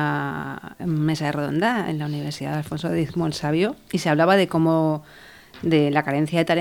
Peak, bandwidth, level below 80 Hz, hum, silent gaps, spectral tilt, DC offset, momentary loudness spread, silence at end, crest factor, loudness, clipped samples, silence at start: -4 dBFS; 19 kHz; -56 dBFS; none; none; -6.5 dB/octave; under 0.1%; 10 LU; 0 s; 18 dB; -22 LUFS; under 0.1%; 0 s